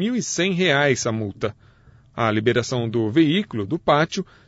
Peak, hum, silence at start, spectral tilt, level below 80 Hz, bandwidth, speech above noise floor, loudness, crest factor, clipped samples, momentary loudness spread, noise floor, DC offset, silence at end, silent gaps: -6 dBFS; none; 0 s; -5 dB/octave; -56 dBFS; 8 kHz; 31 dB; -21 LUFS; 16 dB; under 0.1%; 9 LU; -52 dBFS; under 0.1%; 0.25 s; none